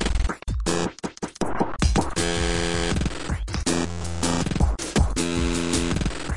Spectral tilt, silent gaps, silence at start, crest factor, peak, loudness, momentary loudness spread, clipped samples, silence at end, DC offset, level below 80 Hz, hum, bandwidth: -4.5 dB/octave; none; 0 s; 16 dB; -8 dBFS; -25 LUFS; 6 LU; under 0.1%; 0 s; 2%; -30 dBFS; none; 11.5 kHz